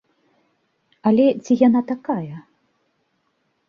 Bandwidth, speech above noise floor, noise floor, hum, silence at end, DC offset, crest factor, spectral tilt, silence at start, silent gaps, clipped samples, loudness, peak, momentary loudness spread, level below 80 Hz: 7 kHz; 51 dB; -69 dBFS; none; 1.3 s; under 0.1%; 20 dB; -7.5 dB/octave; 1.05 s; none; under 0.1%; -19 LUFS; -2 dBFS; 14 LU; -66 dBFS